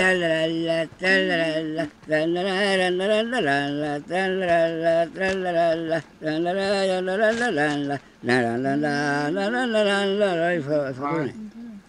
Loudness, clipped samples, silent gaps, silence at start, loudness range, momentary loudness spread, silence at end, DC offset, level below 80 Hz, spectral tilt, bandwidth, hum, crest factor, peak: -23 LUFS; under 0.1%; none; 0 s; 1 LU; 7 LU; 0.1 s; under 0.1%; -60 dBFS; -5 dB/octave; 11 kHz; none; 16 dB; -6 dBFS